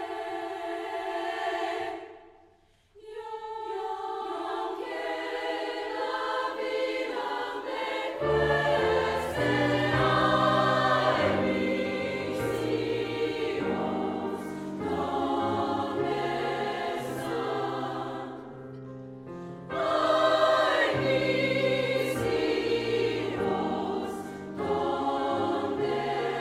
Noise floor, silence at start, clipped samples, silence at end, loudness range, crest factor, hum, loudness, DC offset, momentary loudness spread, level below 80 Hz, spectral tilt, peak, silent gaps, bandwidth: -62 dBFS; 0 s; under 0.1%; 0 s; 10 LU; 18 dB; none; -28 LUFS; under 0.1%; 12 LU; -56 dBFS; -5.5 dB/octave; -12 dBFS; none; 16 kHz